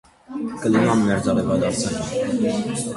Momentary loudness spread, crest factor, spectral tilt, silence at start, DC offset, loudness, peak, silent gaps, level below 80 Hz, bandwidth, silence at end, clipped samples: 10 LU; 16 dB; -5.5 dB/octave; 0.3 s; under 0.1%; -21 LUFS; -6 dBFS; none; -48 dBFS; 11.5 kHz; 0 s; under 0.1%